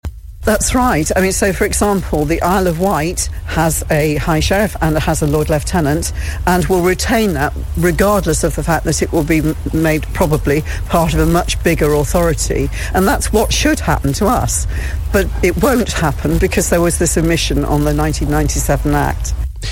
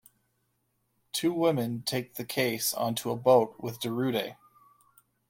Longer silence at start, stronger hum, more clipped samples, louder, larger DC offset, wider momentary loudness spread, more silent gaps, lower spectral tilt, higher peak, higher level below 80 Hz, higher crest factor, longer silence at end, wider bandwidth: second, 0.05 s vs 1.15 s; neither; neither; first, -15 LUFS vs -29 LUFS; neither; second, 4 LU vs 11 LU; neither; about the same, -5 dB/octave vs -4.5 dB/octave; first, 0 dBFS vs -10 dBFS; first, -22 dBFS vs -72 dBFS; second, 14 dB vs 20 dB; second, 0 s vs 0.95 s; about the same, 17 kHz vs 16.5 kHz